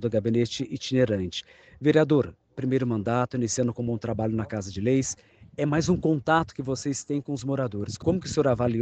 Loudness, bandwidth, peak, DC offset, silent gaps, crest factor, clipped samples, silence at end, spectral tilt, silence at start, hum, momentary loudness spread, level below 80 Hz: -26 LUFS; 9.2 kHz; -6 dBFS; under 0.1%; none; 20 dB; under 0.1%; 0 s; -6 dB/octave; 0 s; none; 8 LU; -52 dBFS